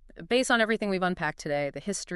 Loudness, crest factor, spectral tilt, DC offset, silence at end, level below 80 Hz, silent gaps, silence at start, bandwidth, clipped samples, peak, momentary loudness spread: -27 LUFS; 18 dB; -4 dB/octave; under 0.1%; 0 s; -56 dBFS; none; 0.15 s; 11.5 kHz; under 0.1%; -10 dBFS; 8 LU